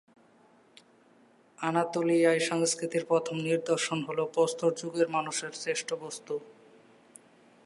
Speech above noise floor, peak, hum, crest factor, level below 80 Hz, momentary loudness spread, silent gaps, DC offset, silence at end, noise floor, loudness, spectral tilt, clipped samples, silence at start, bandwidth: 32 dB; -12 dBFS; none; 18 dB; -84 dBFS; 11 LU; none; under 0.1%; 1.15 s; -61 dBFS; -29 LUFS; -4 dB/octave; under 0.1%; 1.6 s; 11.5 kHz